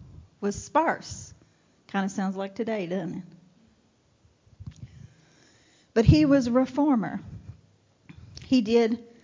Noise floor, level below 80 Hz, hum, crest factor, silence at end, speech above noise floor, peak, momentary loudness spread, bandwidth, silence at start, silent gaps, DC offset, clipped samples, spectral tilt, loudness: -65 dBFS; -44 dBFS; none; 22 dB; 0.2 s; 40 dB; -4 dBFS; 25 LU; 7.6 kHz; 0 s; none; under 0.1%; under 0.1%; -7 dB/octave; -25 LUFS